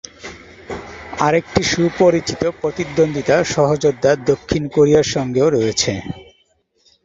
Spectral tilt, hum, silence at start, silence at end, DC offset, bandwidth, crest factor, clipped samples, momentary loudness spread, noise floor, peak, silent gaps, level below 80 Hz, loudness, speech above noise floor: -5 dB/octave; none; 0.25 s; 0.8 s; under 0.1%; 8 kHz; 16 dB; under 0.1%; 17 LU; -61 dBFS; -2 dBFS; none; -44 dBFS; -17 LUFS; 45 dB